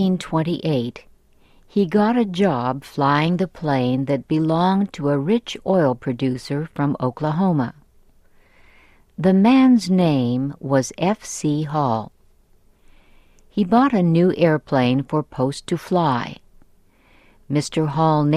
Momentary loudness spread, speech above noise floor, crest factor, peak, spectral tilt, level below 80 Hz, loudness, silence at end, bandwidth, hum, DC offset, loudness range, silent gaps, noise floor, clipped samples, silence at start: 8 LU; 36 dB; 16 dB; -4 dBFS; -7 dB/octave; -52 dBFS; -20 LUFS; 0 s; 12.5 kHz; none; under 0.1%; 5 LU; none; -55 dBFS; under 0.1%; 0 s